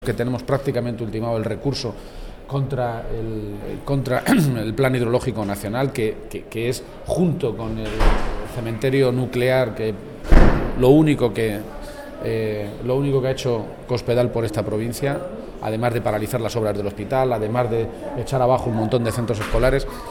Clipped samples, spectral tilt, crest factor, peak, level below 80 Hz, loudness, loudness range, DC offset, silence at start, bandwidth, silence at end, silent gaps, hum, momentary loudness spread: under 0.1%; -6.5 dB/octave; 20 dB; 0 dBFS; -28 dBFS; -22 LUFS; 5 LU; under 0.1%; 0 s; 17 kHz; 0 s; none; none; 11 LU